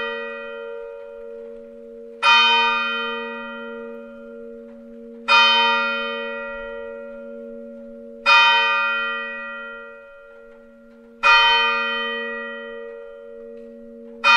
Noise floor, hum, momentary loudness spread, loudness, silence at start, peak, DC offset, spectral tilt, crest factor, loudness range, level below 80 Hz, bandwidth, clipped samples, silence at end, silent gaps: -46 dBFS; none; 26 LU; -17 LUFS; 0 s; -2 dBFS; under 0.1%; -0.5 dB/octave; 20 dB; 1 LU; -56 dBFS; 11 kHz; under 0.1%; 0 s; none